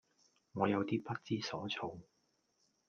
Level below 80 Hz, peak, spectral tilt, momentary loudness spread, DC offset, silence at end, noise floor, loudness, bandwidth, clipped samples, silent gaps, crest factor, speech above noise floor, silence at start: -78 dBFS; -18 dBFS; -6 dB/octave; 13 LU; under 0.1%; 0.85 s; -79 dBFS; -39 LUFS; 7 kHz; under 0.1%; none; 24 dB; 41 dB; 0.55 s